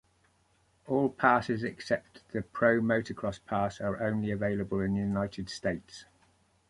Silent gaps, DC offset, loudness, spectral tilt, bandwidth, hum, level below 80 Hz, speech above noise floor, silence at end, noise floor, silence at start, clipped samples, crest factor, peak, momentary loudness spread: none; under 0.1%; -31 LUFS; -6.5 dB/octave; 11.5 kHz; none; -58 dBFS; 39 dB; 0.65 s; -69 dBFS; 0.85 s; under 0.1%; 22 dB; -8 dBFS; 12 LU